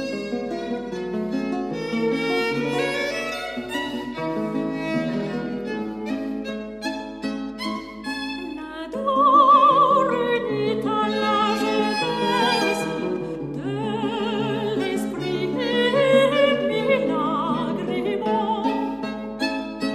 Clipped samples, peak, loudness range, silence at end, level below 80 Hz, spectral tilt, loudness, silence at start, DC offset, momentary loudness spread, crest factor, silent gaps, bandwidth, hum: under 0.1%; -6 dBFS; 9 LU; 0 s; -54 dBFS; -5 dB/octave; -23 LUFS; 0 s; under 0.1%; 12 LU; 18 dB; none; 14 kHz; none